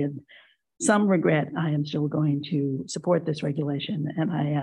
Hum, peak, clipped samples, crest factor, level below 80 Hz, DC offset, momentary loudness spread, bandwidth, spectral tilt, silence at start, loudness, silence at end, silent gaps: none; -6 dBFS; under 0.1%; 18 dB; -70 dBFS; under 0.1%; 8 LU; 11 kHz; -6 dB/octave; 0 s; -26 LUFS; 0 s; none